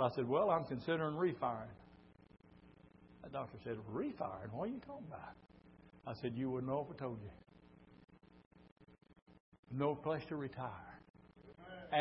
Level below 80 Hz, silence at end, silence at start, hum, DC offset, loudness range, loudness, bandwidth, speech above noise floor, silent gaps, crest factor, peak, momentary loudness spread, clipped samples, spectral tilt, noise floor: -70 dBFS; 0 s; 0 s; none; under 0.1%; 6 LU; -41 LUFS; 5.6 kHz; 23 dB; 8.46-8.51 s, 8.72-8.76 s, 9.22-9.26 s, 9.40-9.52 s, 9.59-9.63 s, 11.10-11.14 s; 22 dB; -20 dBFS; 22 LU; under 0.1%; -5.5 dB/octave; -63 dBFS